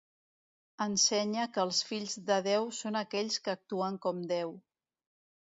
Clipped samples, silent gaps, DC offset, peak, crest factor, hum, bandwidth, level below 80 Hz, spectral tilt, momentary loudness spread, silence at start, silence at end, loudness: under 0.1%; none; under 0.1%; -16 dBFS; 18 dB; none; 7.6 kHz; -80 dBFS; -2.5 dB/octave; 9 LU; 0.8 s; 1 s; -32 LUFS